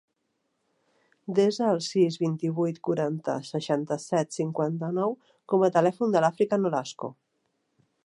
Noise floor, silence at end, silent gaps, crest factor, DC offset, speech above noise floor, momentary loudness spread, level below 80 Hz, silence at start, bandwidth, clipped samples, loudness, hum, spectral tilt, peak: -77 dBFS; 0.95 s; none; 20 dB; under 0.1%; 51 dB; 8 LU; -78 dBFS; 1.3 s; 11.5 kHz; under 0.1%; -26 LUFS; none; -6.5 dB/octave; -8 dBFS